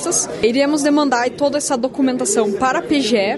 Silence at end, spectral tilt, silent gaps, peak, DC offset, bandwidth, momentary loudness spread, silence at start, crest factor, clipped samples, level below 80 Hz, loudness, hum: 0 s; -3 dB/octave; none; -4 dBFS; under 0.1%; 12 kHz; 3 LU; 0 s; 12 dB; under 0.1%; -52 dBFS; -17 LUFS; none